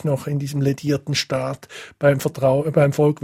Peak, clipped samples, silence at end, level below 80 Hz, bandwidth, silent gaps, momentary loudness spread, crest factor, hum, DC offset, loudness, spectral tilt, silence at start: -4 dBFS; under 0.1%; 0.1 s; -54 dBFS; 15.5 kHz; none; 8 LU; 16 dB; none; under 0.1%; -20 LUFS; -6 dB/octave; 0.05 s